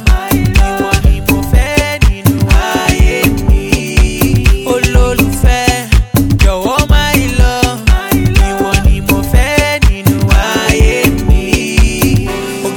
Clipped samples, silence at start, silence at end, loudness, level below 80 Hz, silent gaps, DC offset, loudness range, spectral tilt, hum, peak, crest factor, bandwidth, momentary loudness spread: 1%; 0 s; 0 s; -11 LUFS; -12 dBFS; none; under 0.1%; 1 LU; -5 dB/octave; none; 0 dBFS; 10 dB; 18.5 kHz; 2 LU